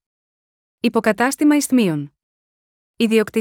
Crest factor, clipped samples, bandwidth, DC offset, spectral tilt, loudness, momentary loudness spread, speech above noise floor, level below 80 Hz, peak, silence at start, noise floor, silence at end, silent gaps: 16 dB; under 0.1%; 18.5 kHz; under 0.1%; -4.5 dB/octave; -18 LUFS; 9 LU; over 73 dB; -64 dBFS; -4 dBFS; 0.85 s; under -90 dBFS; 0 s; 2.23-2.94 s